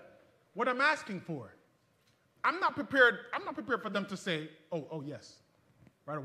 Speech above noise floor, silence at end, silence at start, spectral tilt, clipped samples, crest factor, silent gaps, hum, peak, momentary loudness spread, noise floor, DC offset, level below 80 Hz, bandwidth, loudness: 38 dB; 0 s; 0 s; -4.5 dB/octave; under 0.1%; 24 dB; none; none; -10 dBFS; 18 LU; -71 dBFS; under 0.1%; -80 dBFS; 13.5 kHz; -32 LUFS